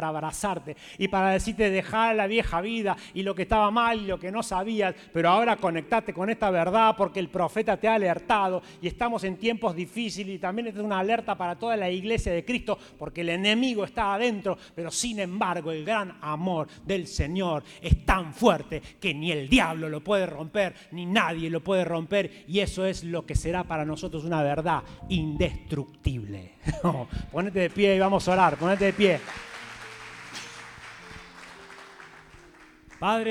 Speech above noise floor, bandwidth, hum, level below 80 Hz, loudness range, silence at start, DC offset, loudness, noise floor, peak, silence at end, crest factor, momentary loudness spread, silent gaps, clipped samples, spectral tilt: 26 dB; 15.5 kHz; none; -42 dBFS; 5 LU; 0 s; under 0.1%; -27 LUFS; -52 dBFS; -6 dBFS; 0 s; 20 dB; 15 LU; none; under 0.1%; -5 dB/octave